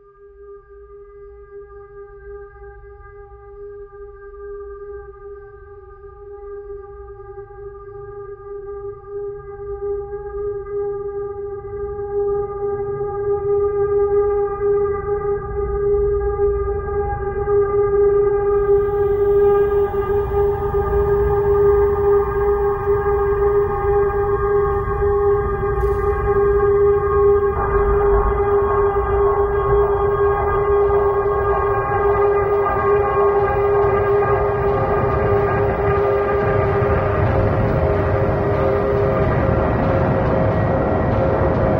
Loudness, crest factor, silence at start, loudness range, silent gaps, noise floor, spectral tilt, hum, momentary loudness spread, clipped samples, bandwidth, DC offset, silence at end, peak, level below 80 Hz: -18 LUFS; 14 dB; 0.25 s; 19 LU; none; -43 dBFS; -10 dB/octave; none; 19 LU; under 0.1%; 4.3 kHz; under 0.1%; 0 s; -4 dBFS; -30 dBFS